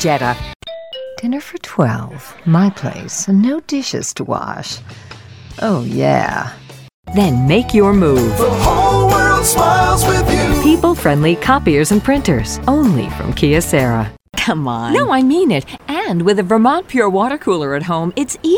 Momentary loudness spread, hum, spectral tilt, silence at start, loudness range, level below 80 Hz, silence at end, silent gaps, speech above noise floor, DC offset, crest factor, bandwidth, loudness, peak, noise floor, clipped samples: 12 LU; none; -5.5 dB/octave; 0 s; 7 LU; -30 dBFS; 0 s; 0.55-0.60 s, 6.94-7.03 s; 21 dB; under 0.1%; 14 dB; over 20 kHz; -14 LUFS; 0 dBFS; -34 dBFS; under 0.1%